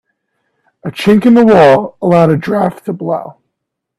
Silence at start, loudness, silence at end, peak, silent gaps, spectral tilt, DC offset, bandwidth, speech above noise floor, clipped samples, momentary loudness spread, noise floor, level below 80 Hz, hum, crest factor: 0.85 s; -10 LUFS; 0.7 s; 0 dBFS; none; -7.5 dB/octave; under 0.1%; 13 kHz; 65 dB; under 0.1%; 15 LU; -74 dBFS; -48 dBFS; none; 12 dB